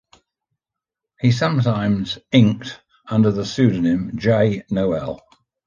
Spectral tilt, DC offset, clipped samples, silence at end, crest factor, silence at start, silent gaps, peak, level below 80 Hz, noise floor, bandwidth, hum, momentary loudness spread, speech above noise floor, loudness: -7.5 dB/octave; under 0.1%; under 0.1%; 0.5 s; 18 dB; 1.2 s; none; -2 dBFS; -48 dBFS; -85 dBFS; 7.4 kHz; none; 12 LU; 67 dB; -19 LUFS